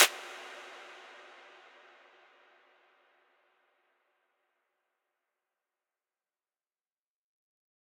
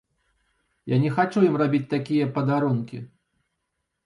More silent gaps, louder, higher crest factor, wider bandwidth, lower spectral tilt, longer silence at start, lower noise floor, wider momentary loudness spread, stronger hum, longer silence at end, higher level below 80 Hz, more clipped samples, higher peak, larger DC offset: neither; second, -34 LUFS vs -23 LUFS; first, 34 dB vs 18 dB; first, 17 kHz vs 11 kHz; second, 3 dB/octave vs -8.5 dB/octave; second, 0 s vs 0.85 s; first, under -90 dBFS vs -79 dBFS; about the same, 15 LU vs 13 LU; neither; first, 7.25 s vs 1 s; second, under -90 dBFS vs -66 dBFS; neither; about the same, -6 dBFS vs -8 dBFS; neither